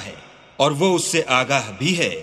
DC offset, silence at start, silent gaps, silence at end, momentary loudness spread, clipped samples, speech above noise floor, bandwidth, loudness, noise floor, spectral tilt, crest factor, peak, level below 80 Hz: under 0.1%; 0 s; none; 0 s; 4 LU; under 0.1%; 22 dB; 15 kHz; -19 LUFS; -42 dBFS; -3.5 dB/octave; 18 dB; -2 dBFS; -60 dBFS